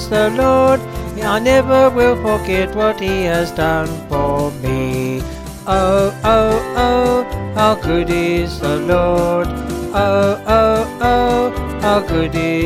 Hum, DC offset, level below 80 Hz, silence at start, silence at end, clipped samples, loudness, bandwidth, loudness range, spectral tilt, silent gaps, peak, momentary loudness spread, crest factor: none; under 0.1%; -30 dBFS; 0 s; 0 s; under 0.1%; -15 LUFS; 16 kHz; 3 LU; -6 dB/octave; none; 0 dBFS; 7 LU; 14 dB